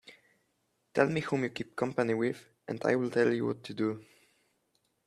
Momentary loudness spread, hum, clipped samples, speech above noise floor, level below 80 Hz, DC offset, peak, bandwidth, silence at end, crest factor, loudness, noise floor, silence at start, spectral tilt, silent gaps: 8 LU; none; under 0.1%; 46 dB; -72 dBFS; under 0.1%; -10 dBFS; 13 kHz; 1.05 s; 24 dB; -31 LUFS; -77 dBFS; 0.1 s; -6.5 dB/octave; none